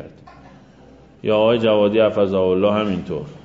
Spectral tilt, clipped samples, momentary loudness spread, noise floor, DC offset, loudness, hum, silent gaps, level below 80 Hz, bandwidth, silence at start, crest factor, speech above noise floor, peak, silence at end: -8 dB/octave; under 0.1%; 10 LU; -46 dBFS; under 0.1%; -18 LUFS; none; none; -52 dBFS; 7.4 kHz; 0 s; 16 dB; 29 dB; -4 dBFS; 0.05 s